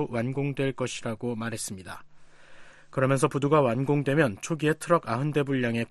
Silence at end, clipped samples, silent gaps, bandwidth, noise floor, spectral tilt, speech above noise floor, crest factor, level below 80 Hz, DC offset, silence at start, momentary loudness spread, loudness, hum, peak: 0.05 s; under 0.1%; none; 12.5 kHz; -48 dBFS; -6 dB/octave; 21 dB; 20 dB; -58 dBFS; under 0.1%; 0 s; 11 LU; -27 LUFS; none; -8 dBFS